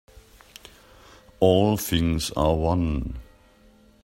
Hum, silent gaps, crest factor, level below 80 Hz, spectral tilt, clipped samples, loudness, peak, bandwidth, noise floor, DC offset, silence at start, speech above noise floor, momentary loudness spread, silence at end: none; none; 20 dB; -38 dBFS; -6 dB/octave; under 0.1%; -23 LUFS; -4 dBFS; 16 kHz; -55 dBFS; under 0.1%; 1.4 s; 33 dB; 11 LU; 0.8 s